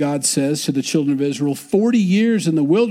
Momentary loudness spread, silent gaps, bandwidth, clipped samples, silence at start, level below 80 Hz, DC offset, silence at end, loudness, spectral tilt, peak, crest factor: 4 LU; none; 16 kHz; under 0.1%; 0 s; -66 dBFS; under 0.1%; 0 s; -18 LUFS; -5 dB/octave; -4 dBFS; 14 dB